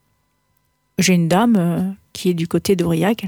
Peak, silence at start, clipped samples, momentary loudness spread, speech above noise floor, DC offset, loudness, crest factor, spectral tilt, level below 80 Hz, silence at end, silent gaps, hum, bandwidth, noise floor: -4 dBFS; 1 s; under 0.1%; 8 LU; 49 dB; under 0.1%; -18 LUFS; 14 dB; -5.5 dB/octave; -52 dBFS; 0 s; none; none; 18.5 kHz; -65 dBFS